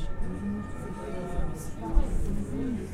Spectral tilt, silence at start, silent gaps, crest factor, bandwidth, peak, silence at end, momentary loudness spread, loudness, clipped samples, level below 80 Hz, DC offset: -7.5 dB/octave; 0 s; none; 20 dB; 12.5 kHz; -10 dBFS; 0 s; 6 LU; -34 LUFS; under 0.1%; -32 dBFS; under 0.1%